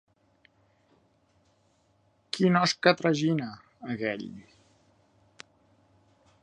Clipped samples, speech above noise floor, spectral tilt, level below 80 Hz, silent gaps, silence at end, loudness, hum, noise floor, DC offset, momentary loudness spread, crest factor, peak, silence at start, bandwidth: under 0.1%; 41 dB; -5.5 dB/octave; -72 dBFS; none; 2.05 s; -27 LUFS; none; -68 dBFS; under 0.1%; 20 LU; 26 dB; -6 dBFS; 2.35 s; 11 kHz